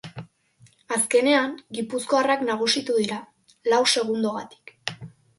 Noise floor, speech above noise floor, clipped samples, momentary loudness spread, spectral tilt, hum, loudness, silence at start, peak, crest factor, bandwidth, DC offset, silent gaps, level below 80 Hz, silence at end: -57 dBFS; 35 dB; under 0.1%; 16 LU; -2.5 dB/octave; none; -23 LUFS; 0.05 s; -6 dBFS; 18 dB; 11.5 kHz; under 0.1%; none; -68 dBFS; 0.3 s